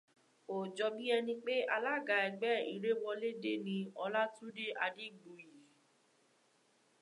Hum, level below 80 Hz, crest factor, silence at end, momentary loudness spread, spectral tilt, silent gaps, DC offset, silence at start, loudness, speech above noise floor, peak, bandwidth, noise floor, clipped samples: none; under -90 dBFS; 20 dB; 1.4 s; 10 LU; -5 dB/octave; none; under 0.1%; 0.5 s; -37 LUFS; 36 dB; -20 dBFS; 11 kHz; -73 dBFS; under 0.1%